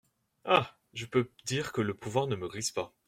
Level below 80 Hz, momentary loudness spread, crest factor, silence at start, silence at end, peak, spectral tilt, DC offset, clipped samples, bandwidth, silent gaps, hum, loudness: -66 dBFS; 10 LU; 24 dB; 0.45 s; 0.2 s; -10 dBFS; -4.5 dB/octave; under 0.1%; under 0.1%; 16 kHz; none; none; -32 LUFS